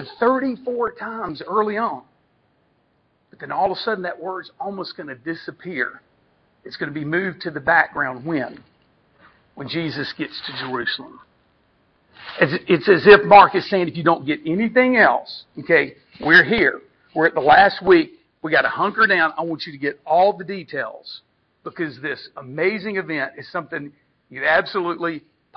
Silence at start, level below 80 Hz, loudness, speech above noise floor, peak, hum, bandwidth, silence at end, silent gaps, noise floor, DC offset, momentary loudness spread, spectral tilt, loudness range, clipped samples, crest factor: 0 s; -56 dBFS; -19 LUFS; 45 dB; 0 dBFS; none; 6.2 kHz; 0.4 s; none; -64 dBFS; under 0.1%; 19 LU; -7.5 dB/octave; 13 LU; under 0.1%; 20 dB